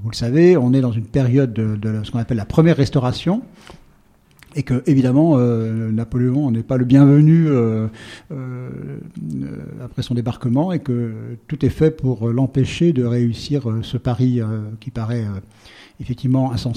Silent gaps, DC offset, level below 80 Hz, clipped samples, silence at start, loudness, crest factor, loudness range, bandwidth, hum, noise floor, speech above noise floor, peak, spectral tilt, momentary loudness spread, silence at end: none; under 0.1%; -44 dBFS; under 0.1%; 0 s; -18 LUFS; 16 dB; 8 LU; 10 kHz; none; -53 dBFS; 35 dB; 0 dBFS; -8.5 dB/octave; 17 LU; 0 s